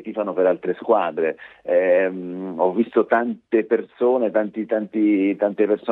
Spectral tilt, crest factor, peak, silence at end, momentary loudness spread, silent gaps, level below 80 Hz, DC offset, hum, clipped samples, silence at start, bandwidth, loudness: -9.5 dB/octave; 16 dB; -4 dBFS; 0 s; 6 LU; none; -72 dBFS; under 0.1%; none; under 0.1%; 0 s; 4 kHz; -21 LUFS